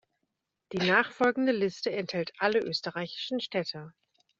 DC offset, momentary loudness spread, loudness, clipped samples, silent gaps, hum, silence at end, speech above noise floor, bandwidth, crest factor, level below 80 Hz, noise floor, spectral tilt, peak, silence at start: under 0.1%; 10 LU; -29 LUFS; under 0.1%; none; none; 0.5 s; 53 dB; 7.8 kHz; 22 dB; -72 dBFS; -83 dBFS; -2.5 dB/octave; -8 dBFS; 0.7 s